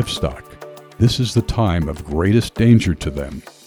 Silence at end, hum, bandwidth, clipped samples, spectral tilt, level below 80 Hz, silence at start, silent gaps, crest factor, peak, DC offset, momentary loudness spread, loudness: 0.15 s; none; 13.5 kHz; under 0.1%; -6.5 dB/octave; -32 dBFS; 0 s; none; 16 dB; -2 dBFS; under 0.1%; 21 LU; -18 LUFS